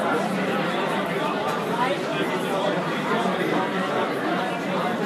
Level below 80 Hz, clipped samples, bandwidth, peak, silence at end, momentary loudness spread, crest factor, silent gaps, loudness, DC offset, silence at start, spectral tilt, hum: -68 dBFS; under 0.1%; 15.5 kHz; -12 dBFS; 0 s; 2 LU; 14 dB; none; -24 LUFS; under 0.1%; 0 s; -5.5 dB/octave; none